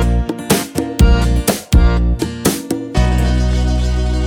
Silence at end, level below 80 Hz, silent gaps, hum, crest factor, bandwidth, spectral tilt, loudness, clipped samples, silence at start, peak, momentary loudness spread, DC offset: 0 s; -16 dBFS; none; none; 14 dB; 19.5 kHz; -5.5 dB/octave; -16 LUFS; under 0.1%; 0 s; 0 dBFS; 6 LU; under 0.1%